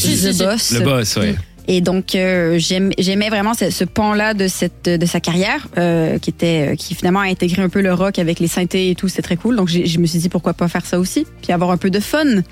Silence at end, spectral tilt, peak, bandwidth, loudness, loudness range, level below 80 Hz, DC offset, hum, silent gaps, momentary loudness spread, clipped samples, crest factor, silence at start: 0.05 s; -5 dB/octave; -2 dBFS; 16 kHz; -16 LUFS; 1 LU; -42 dBFS; under 0.1%; none; none; 4 LU; under 0.1%; 14 dB; 0 s